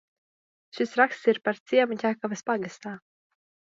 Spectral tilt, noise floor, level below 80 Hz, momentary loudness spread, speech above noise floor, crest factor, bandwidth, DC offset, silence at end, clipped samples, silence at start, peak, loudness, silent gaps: -4.5 dB/octave; under -90 dBFS; -80 dBFS; 17 LU; over 64 dB; 22 dB; 7.8 kHz; under 0.1%; 0.8 s; under 0.1%; 0.75 s; -6 dBFS; -26 LUFS; 1.60-1.66 s